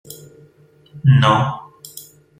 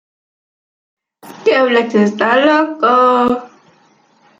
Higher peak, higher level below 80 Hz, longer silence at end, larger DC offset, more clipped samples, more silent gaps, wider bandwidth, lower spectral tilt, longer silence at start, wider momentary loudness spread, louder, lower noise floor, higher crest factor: about the same, -2 dBFS vs 0 dBFS; first, -52 dBFS vs -58 dBFS; second, 0.4 s vs 0.9 s; neither; neither; neither; first, 16 kHz vs 14.5 kHz; about the same, -6.5 dB/octave vs -5.5 dB/octave; second, 0.1 s vs 1.25 s; first, 25 LU vs 6 LU; about the same, -15 LUFS vs -13 LUFS; about the same, -51 dBFS vs -52 dBFS; about the same, 16 dB vs 14 dB